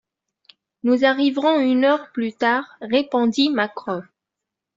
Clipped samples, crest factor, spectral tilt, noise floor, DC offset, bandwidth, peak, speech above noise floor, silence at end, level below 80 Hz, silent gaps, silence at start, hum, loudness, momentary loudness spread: under 0.1%; 16 dB; -5 dB/octave; -84 dBFS; under 0.1%; 7.6 kHz; -4 dBFS; 65 dB; 0.75 s; -68 dBFS; none; 0.85 s; none; -20 LUFS; 10 LU